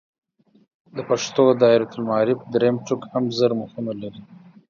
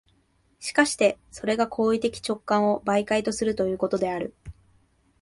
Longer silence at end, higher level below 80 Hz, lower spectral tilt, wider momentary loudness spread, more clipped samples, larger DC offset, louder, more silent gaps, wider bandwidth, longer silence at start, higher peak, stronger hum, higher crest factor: second, 0.35 s vs 0.7 s; second, -66 dBFS vs -56 dBFS; first, -5.5 dB/octave vs -4 dB/octave; first, 15 LU vs 9 LU; neither; neither; first, -21 LUFS vs -25 LUFS; neither; second, 7.4 kHz vs 11.5 kHz; first, 0.95 s vs 0.6 s; first, -2 dBFS vs -6 dBFS; neither; about the same, 18 dB vs 20 dB